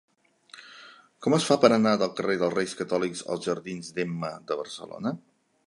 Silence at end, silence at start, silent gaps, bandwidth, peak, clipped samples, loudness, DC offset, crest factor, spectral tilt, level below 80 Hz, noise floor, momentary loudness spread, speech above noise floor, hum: 0.5 s; 0.55 s; none; 11.5 kHz; -2 dBFS; under 0.1%; -27 LUFS; under 0.1%; 24 dB; -5 dB/octave; -70 dBFS; -54 dBFS; 22 LU; 28 dB; none